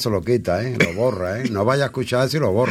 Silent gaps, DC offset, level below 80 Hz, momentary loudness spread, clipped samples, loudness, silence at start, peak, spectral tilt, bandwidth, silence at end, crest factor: none; under 0.1%; -48 dBFS; 4 LU; under 0.1%; -20 LUFS; 0 s; -4 dBFS; -6 dB/octave; 16 kHz; 0 s; 16 dB